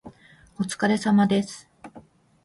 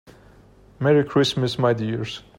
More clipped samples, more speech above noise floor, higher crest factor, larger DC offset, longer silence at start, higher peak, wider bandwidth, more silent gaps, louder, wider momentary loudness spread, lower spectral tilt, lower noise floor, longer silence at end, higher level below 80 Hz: neither; about the same, 31 dB vs 30 dB; about the same, 18 dB vs 18 dB; neither; second, 0.05 s vs 0.8 s; about the same, -8 dBFS vs -6 dBFS; second, 11.5 kHz vs 16 kHz; neither; about the same, -23 LUFS vs -21 LUFS; first, 15 LU vs 8 LU; about the same, -5.5 dB/octave vs -6 dB/octave; about the same, -53 dBFS vs -51 dBFS; first, 0.45 s vs 0.2 s; second, -62 dBFS vs -54 dBFS